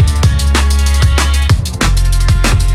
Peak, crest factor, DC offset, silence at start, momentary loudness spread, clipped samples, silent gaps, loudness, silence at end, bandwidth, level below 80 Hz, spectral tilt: 0 dBFS; 10 dB; under 0.1%; 0 s; 2 LU; under 0.1%; none; -12 LUFS; 0 s; 14.5 kHz; -12 dBFS; -4.5 dB/octave